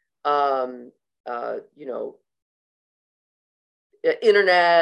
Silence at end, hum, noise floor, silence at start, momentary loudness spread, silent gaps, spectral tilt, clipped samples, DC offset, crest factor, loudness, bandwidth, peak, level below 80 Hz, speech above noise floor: 0 s; none; under -90 dBFS; 0.25 s; 19 LU; 1.20-1.24 s, 2.42-3.90 s; -4 dB/octave; under 0.1%; under 0.1%; 18 dB; -21 LUFS; 10 kHz; -4 dBFS; -82 dBFS; over 69 dB